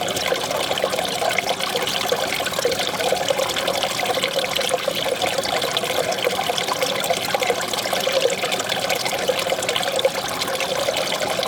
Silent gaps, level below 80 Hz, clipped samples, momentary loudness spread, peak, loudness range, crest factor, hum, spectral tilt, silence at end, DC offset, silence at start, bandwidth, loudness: none; -56 dBFS; under 0.1%; 1 LU; -2 dBFS; 0 LU; 20 dB; none; -1.5 dB/octave; 0 s; under 0.1%; 0 s; over 20 kHz; -21 LUFS